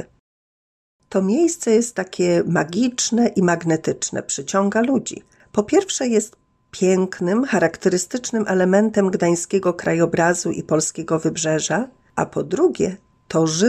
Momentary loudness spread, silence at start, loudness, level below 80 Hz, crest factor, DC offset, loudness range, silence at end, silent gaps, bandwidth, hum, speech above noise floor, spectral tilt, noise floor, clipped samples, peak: 7 LU; 0 s; -20 LUFS; -58 dBFS; 16 dB; under 0.1%; 2 LU; 0 s; 0.20-0.99 s; 14 kHz; none; over 71 dB; -4.5 dB/octave; under -90 dBFS; under 0.1%; -4 dBFS